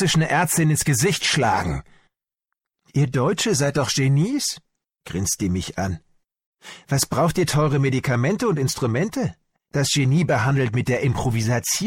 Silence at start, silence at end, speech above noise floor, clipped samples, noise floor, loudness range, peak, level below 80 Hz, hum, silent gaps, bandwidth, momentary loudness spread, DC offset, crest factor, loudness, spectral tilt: 0 s; 0 s; 63 dB; under 0.1%; -83 dBFS; 3 LU; -8 dBFS; -46 dBFS; none; 6.46-6.53 s; 16.5 kHz; 9 LU; under 0.1%; 14 dB; -21 LUFS; -4.5 dB/octave